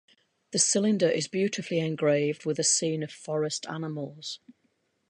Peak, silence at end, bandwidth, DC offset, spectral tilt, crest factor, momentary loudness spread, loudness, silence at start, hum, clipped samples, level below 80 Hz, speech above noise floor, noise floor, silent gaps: -10 dBFS; 0.75 s; 11.5 kHz; under 0.1%; -3.5 dB/octave; 18 dB; 12 LU; -27 LUFS; 0.5 s; none; under 0.1%; -76 dBFS; 45 dB; -73 dBFS; none